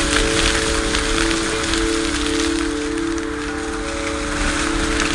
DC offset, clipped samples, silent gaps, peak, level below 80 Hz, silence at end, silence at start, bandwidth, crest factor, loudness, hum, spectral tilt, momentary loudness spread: under 0.1%; under 0.1%; none; 0 dBFS; -28 dBFS; 0 s; 0 s; 11.5 kHz; 20 dB; -19 LUFS; none; -3 dB/octave; 7 LU